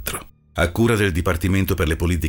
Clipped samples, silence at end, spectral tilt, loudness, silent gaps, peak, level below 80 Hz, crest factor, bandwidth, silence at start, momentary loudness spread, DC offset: under 0.1%; 0 s; -5.5 dB/octave; -20 LUFS; none; -6 dBFS; -30 dBFS; 14 dB; 20 kHz; 0 s; 11 LU; under 0.1%